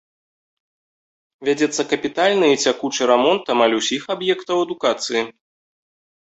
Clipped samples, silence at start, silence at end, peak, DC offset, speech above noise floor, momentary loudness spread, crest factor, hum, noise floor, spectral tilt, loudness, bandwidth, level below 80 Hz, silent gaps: under 0.1%; 1.4 s; 1 s; -2 dBFS; under 0.1%; over 71 dB; 7 LU; 18 dB; none; under -90 dBFS; -3 dB/octave; -19 LUFS; 8.2 kHz; -66 dBFS; none